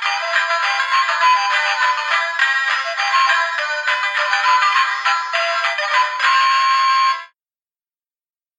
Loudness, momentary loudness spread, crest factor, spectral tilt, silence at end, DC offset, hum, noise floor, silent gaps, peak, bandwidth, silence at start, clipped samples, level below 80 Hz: -16 LUFS; 4 LU; 16 dB; 5 dB/octave; 1.3 s; under 0.1%; none; under -90 dBFS; none; -2 dBFS; 9.6 kHz; 0 s; under 0.1%; -80 dBFS